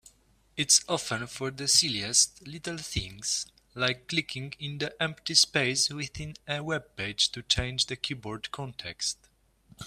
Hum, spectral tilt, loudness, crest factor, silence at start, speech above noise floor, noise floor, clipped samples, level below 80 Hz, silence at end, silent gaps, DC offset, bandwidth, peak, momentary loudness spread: none; -1.5 dB/octave; -27 LUFS; 24 dB; 0.55 s; 33 dB; -63 dBFS; under 0.1%; -52 dBFS; 0 s; none; under 0.1%; 15.5 kHz; -6 dBFS; 15 LU